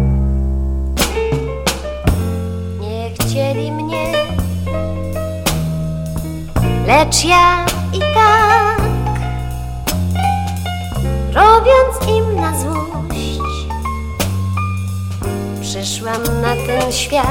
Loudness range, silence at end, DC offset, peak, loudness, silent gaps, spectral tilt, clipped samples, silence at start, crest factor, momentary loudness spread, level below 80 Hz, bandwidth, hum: 7 LU; 0 s; under 0.1%; 0 dBFS; -16 LUFS; none; -4.5 dB/octave; under 0.1%; 0 s; 14 dB; 12 LU; -24 dBFS; 17 kHz; none